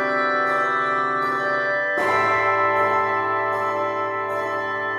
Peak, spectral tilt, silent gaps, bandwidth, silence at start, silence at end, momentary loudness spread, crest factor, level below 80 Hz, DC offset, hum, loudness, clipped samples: -8 dBFS; -5 dB/octave; none; 14.5 kHz; 0 s; 0 s; 6 LU; 14 dB; -64 dBFS; under 0.1%; none; -21 LUFS; under 0.1%